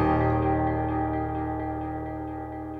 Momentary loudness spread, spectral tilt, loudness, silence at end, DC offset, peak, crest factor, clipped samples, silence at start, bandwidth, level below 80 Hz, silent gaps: 11 LU; -10.5 dB/octave; -28 LUFS; 0 s; under 0.1%; -12 dBFS; 14 dB; under 0.1%; 0 s; 4.7 kHz; -38 dBFS; none